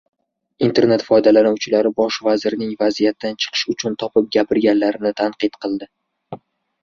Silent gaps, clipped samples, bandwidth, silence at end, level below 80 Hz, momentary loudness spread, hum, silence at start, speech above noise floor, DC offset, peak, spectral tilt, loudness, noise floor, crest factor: none; under 0.1%; 7.4 kHz; 0.45 s; -58 dBFS; 11 LU; none; 0.6 s; 20 dB; under 0.1%; -2 dBFS; -5 dB/octave; -18 LUFS; -37 dBFS; 16 dB